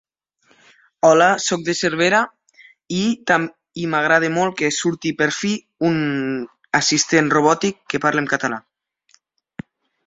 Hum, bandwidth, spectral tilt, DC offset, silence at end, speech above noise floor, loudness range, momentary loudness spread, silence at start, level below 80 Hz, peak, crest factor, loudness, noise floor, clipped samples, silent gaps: none; 8 kHz; -3.5 dB/octave; under 0.1%; 1.45 s; 43 dB; 2 LU; 12 LU; 1.05 s; -60 dBFS; 0 dBFS; 18 dB; -18 LUFS; -61 dBFS; under 0.1%; none